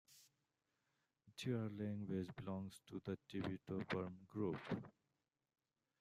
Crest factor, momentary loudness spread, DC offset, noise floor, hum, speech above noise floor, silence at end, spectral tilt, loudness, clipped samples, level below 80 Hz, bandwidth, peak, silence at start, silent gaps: 20 dB; 6 LU; under 0.1%; under -90 dBFS; none; over 44 dB; 1.1 s; -7 dB/octave; -47 LUFS; under 0.1%; -80 dBFS; 15 kHz; -28 dBFS; 0.1 s; none